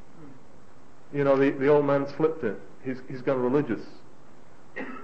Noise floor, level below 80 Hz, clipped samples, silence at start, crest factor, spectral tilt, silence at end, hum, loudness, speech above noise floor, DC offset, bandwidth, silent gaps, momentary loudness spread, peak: -54 dBFS; -64 dBFS; under 0.1%; 0.2 s; 18 dB; -8.5 dB/octave; 0 s; none; -26 LUFS; 29 dB; 1%; 7.8 kHz; none; 16 LU; -10 dBFS